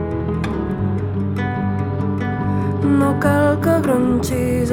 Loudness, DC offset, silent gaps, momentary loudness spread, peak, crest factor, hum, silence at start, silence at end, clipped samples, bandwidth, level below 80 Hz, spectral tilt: -19 LUFS; under 0.1%; none; 6 LU; -2 dBFS; 16 dB; none; 0 s; 0 s; under 0.1%; 16.5 kHz; -36 dBFS; -7.5 dB/octave